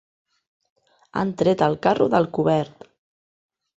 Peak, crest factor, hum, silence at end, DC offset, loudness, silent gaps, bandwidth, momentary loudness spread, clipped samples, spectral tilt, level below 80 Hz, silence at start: -4 dBFS; 20 dB; none; 1.1 s; under 0.1%; -21 LUFS; none; 8 kHz; 9 LU; under 0.1%; -7.5 dB/octave; -60 dBFS; 1.15 s